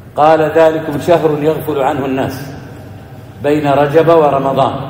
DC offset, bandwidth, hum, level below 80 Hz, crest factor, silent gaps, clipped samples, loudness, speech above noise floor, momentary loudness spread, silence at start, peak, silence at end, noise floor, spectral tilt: under 0.1%; 16.5 kHz; none; -46 dBFS; 12 dB; none; 0.7%; -12 LUFS; 20 dB; 21 LU; 0 s; 0 dBFS; 0 s; -32 dBFS; -7 dB/octave